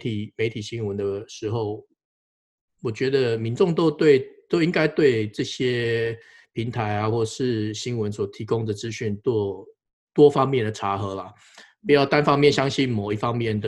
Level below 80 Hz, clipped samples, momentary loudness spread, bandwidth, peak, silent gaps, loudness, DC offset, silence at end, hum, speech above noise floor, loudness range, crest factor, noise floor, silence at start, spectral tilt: -58 dBFS; under 0.1%; 13 LU; 11 kHz; -4 dBFS; 2.05-2.68 s, 9.93-10.07 s; -23 LUFS; under 0.1%; 0 s; none; over 68 dB; 6 LU; 20 dB; under -90 dBFS; 0 s; -6 dB/octave